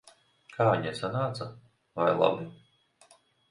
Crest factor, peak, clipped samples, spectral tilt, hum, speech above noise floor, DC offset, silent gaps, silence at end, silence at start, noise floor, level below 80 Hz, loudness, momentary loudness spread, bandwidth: 22 dB; -8 dBFS; under 0.1%; -6.5 dB/octave; none; 34 dB; under 0.1%; none; 0.95 s; 0.5 s; -62 dBFS; -66 dBFS; -29 LUFS; 18 LU; 11 kHz